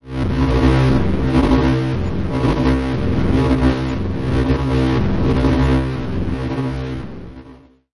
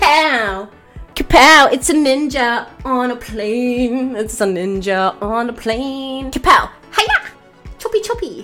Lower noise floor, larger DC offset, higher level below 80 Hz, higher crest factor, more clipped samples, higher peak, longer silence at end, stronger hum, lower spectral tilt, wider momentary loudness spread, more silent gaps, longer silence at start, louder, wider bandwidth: first, -43 dBFS vs -37 dBFS; neither; first, -24 dBFS vs -34 dBFS; about the same, 14 dB vs 16 dB; neither; about the same, -2 dBFS vs 0 dBFS; about the same, 0 s vs 0 s; neither; first, -8 dB/octave vs -3 dB/octave; second, 8 LU vs 14 LU; neither; about the same, 0 s vs 0 s; second, -18 LUFS vs -15 LUFS; second, 11.5 kHz vs 19 kHz